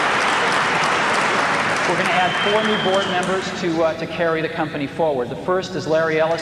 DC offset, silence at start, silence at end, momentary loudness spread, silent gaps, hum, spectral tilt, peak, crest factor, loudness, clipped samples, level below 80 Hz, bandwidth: under 0.1%; 0 s; 0 s; 5 LU; none; none; -4 dB/octave; -6 dBFS; 14 dB; -19 LUFS; under 0.1%; -54 dBFS; 13.5 kHz